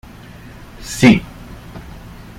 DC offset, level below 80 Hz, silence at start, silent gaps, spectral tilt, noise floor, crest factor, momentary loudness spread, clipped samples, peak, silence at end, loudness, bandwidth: under 0.1%; -38 dBFS; 0.8 s; none; -5.5 dB/octave; -37 dBFS; 18 dB; 26 LU; under 0.1%; 0 dBFS; 0.6 s; -14 LUFS; 16 kHz